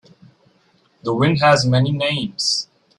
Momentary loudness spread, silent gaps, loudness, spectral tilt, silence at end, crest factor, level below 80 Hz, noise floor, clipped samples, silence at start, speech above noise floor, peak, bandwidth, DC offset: 9 LU; none; -17 LUFS; -5 dB/octave; 0.35 s; 18 dB; -54 dBFS; -59 dBFS; under 0.1%; 1.05 s; 42 dB; -2 dBFS; 11.5 kHz; under 0.1%